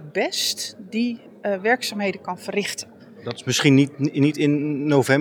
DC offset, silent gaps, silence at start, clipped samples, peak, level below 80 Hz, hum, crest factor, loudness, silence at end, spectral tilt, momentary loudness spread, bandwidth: under 0.1%; none; 0 s; under 0.1%; -2 dBFS; -76 dBFS; none; 20 dB; -22 LUFS; 0 s; -4.5 dB/octave; 13 LU; 19 kHz